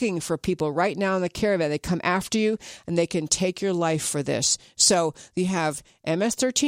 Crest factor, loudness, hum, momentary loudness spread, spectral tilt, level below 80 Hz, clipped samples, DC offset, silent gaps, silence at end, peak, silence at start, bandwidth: 20 dB; -24 LUFS; none; 8 LU; -3.5 dB/octave; -54 dBFS; under 0.1%; under 0.1%; none; 0 s; -4 dBFS; 0 s; 16 kHz